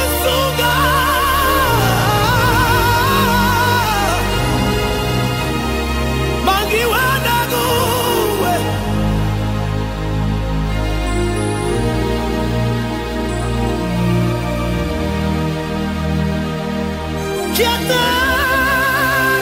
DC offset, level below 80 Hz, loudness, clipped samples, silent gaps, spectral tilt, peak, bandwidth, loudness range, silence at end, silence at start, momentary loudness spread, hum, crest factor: under 0.1%; -26 dBFS; -16 LUFS; under 0.1%; none; -4.5 dB/octave; -2 dBFS; 16.5 kHz; 5 LU; 0 s; 0 s; 7 LU; none; 14 dB